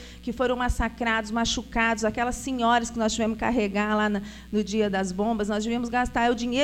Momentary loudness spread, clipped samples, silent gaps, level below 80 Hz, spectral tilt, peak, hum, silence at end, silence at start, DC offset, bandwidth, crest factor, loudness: 4 LU; under 0.1%; none; -40 dBFS; -4 dB/octave; -10 dBFS; none; 0 s; 0 s; under 0.1%; 15 kHz; 16 dB; -26 LUFS